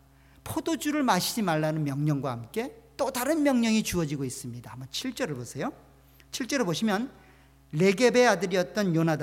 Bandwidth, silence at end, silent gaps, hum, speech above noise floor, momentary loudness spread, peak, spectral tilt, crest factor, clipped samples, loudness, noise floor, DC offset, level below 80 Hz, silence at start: 17 kHz; 0 s; none; none; 20 dB; 14 LU; -8 dBFS; -5 dB/octave; 18 dB; under 0.1%; -27 LUFS; -47 dBFS; under 0.1%; -58 dBFS; 0.45 s